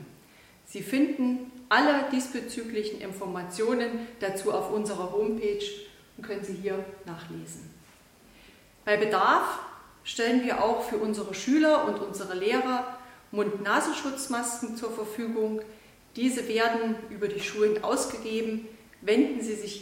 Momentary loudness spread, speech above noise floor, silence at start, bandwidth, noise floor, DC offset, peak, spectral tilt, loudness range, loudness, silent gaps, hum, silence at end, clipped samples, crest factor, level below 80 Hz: 17 LU; 28 dB; 0 s; 16.5 kHz; -56 dBFS; under 0.1%; -8 dBFS; -4 dB/octave; 6 LU; -28 LUFS; none; none; 0 s; under 0.1%; 20 dB; -64 dBFS